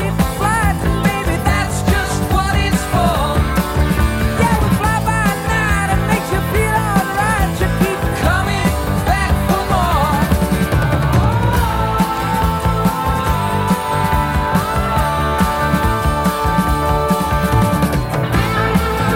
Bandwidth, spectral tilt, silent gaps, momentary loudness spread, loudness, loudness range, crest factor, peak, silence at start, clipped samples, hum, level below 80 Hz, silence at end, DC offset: 17 kHz; -5.5 dB/octave; none; 2 LU; -16 LUFS; 1 LU; 14 dB; 0 dBFS; 0 s; under 0.1%; none; -22 dBFS; 0 s; under 0.1%